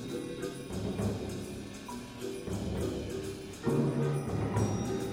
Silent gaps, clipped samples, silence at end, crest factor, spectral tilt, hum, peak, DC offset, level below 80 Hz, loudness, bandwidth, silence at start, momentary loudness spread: none; under 0.1%; 0 s; 16 dB; -6.5 dB/octave; none; -18 dBFS; under 0.1%; -50 dBFS; -35 LUFS; 16 kHz; 0 s; 10 LU